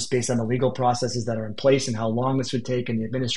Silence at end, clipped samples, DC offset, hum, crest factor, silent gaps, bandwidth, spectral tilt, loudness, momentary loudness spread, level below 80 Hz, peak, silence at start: 0 s; under 0.1%; 1%; none; 16 dB; none; 11.5 kHz; -5.5 dB/octave; -24 LUFS; 5 LU; -58 dBFS; -8 dBFS; 0 s